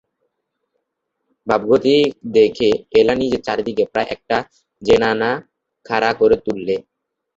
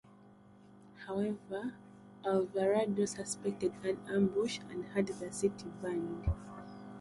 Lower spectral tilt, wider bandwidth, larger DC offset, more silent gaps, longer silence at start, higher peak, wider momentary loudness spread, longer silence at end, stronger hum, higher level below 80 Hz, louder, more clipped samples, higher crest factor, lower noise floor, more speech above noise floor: about the same, -5.5 dB/octave vs -5.5 dB/octave; second, 7.6 kHz vs 11.5 kHz; neither; neither; first, 1.45 s vs 0.05 s; first, 0 dBFS vs -18 dBFS; second, 8 LU vs 13 LU; first, 0.55 s vs 0 s; second, none vs 50 Hz at -50 dBFS; about the same, -50 dBFS vs -52 dBFS; first, -17 LUFS vs -36 LUFS; neither; about the same, 18 dB vs 18 dB; first, -75 dBFS vs -59 dBFS; first, 59 dB vs 24 dB